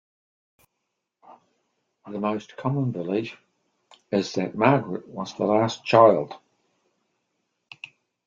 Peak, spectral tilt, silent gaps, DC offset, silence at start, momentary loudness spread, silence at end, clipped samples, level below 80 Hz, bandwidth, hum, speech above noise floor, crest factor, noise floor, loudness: -2 dBFS; -6.5 dB/octave; none; under 0.1%; 1.3 s; 23 LU; 1.9 s; under 0.1%; -68 dBFS; 7.6 kHz; none; 58 dB; 24 dB; -80 dBFS; -23 LUFS